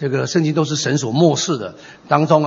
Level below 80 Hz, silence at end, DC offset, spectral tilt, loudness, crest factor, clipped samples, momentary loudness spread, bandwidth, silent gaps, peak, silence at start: -60 dBFS; 0 s; under 0.1%; -5 dB/octave; -17 LUFS; 16 dB; under 0.1%; 7 LU; 8 kHz; none; 0 dBFS; 0 s